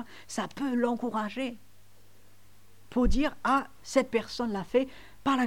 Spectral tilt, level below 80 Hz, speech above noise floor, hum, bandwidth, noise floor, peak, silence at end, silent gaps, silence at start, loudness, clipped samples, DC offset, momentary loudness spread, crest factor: -5 dB/octave; -40 dBFS; 32 dB; none; 16.5 kHz; -60 dBFS; -12 dBFS; 0 s; none; 0 s; -30 LUFS; under 0.1%; 0.3%; 8 LU; 18 dB